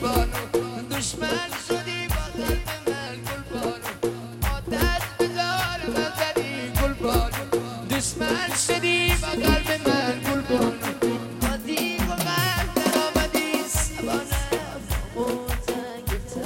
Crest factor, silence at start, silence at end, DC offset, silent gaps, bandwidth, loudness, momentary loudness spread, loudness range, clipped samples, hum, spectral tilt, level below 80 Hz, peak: 18 dB; 0 s; 0 s; under 0.1%; none; 17 kHz; -25 LUFS; 8 LU; 5 LU; under 0.1%; none; -4 dB/octave; -34 dBFS; -6 dBFS